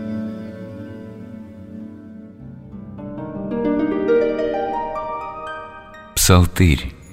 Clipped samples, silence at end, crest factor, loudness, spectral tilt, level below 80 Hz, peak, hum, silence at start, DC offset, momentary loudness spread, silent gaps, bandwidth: under 0.1%; 0 s; 20 dB; -20 LUFS; -5 dB/octave; -34 dBFS; -2 dBFS; none; 0 s; under 0.1%; 22 LU; none; 16 kHz